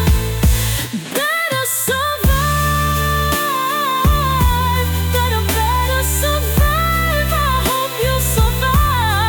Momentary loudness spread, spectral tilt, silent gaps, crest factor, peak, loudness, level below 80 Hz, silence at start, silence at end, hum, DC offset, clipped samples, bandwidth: 3 LU; -4 dB/octave; none; 12 dB; -4 dBFS; -16 LUFS; -22 dBFS; 0 s; 0 s; none; under 0.1%; under 0.1%; 19.5 kHz